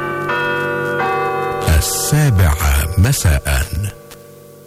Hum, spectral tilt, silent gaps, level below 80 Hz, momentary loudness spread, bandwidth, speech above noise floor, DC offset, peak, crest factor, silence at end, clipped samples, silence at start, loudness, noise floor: none; -4.5 dB/octave; none; -22 dBFS; 5 LU; 16 kHz; 25 dB; under 0.1%; -2 dBFS; 12 dB; 0.05 s; under 0.1%; 0 s; -16 LUFS; -39 dBFS